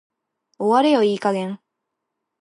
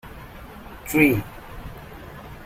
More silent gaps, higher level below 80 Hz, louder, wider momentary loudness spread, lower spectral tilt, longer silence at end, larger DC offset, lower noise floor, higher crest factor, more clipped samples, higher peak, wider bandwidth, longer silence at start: neither; second, -78 dBFS vs -44 dBFS; about the same, -19 LUFS vs -20 LUFS; second, 14 LU vs 23 LU; about the same, -6 dB/octave vs -6 dB/octave; first, 0.85 s vs 0 s; neither; first, -80 dBFS vs -40 dBFS; second, 18 dB vs 24 dB; neither; about the same, -4 dBFS vs -4 dBFS; second, 11 kHz vs 16 kHz; first, 0.6 s vs 0.05 s